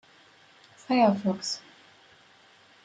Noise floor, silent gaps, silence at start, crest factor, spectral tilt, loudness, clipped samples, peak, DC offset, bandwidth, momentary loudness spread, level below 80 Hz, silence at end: -58 dBFS; none; 0.9 s; 20 dB; -5 dB/octave; -26 LUFS; under 0.1%; -10 dBFS; under 0.1%; 9.4 kHz; 11 LU; -76 dBFS; 1.25 s